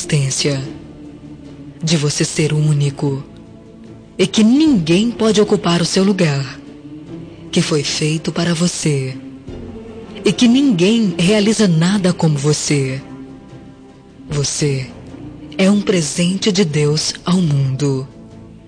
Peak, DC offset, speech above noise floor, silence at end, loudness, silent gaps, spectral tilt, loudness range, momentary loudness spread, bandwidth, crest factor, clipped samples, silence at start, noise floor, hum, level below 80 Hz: -2 dBFS; under 0.1%; 25 dB; 0.1 s; -15 LUFS; none; -5 dB/octave; 5 LU; 21 LU; 10 kHz; 14 dB; under 0.1%; 0 s; -40 dBFS; none; -46 dBFS